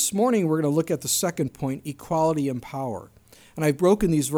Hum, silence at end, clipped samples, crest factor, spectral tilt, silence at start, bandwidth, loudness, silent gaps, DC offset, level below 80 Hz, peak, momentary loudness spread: none; 0 s; under 0.1%; 16 dB; -5 dB/octave; 0 s; over 20 kHz; -24 LUFS; none; under 0.1%; -50 dBFS; -8 dBFS; 11 LU